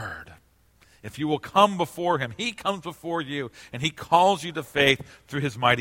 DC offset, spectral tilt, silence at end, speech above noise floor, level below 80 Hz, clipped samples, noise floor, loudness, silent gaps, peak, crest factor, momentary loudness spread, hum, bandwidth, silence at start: under 0.1%; -4.5 dB/octave; 0 s; 35 dB; -58 dBFS; under 0.1%; -60 dBFS; -25 LUFS; none; -4 dBFS; 22 dB; 14 LU; none; 16.5 kHz; 0 s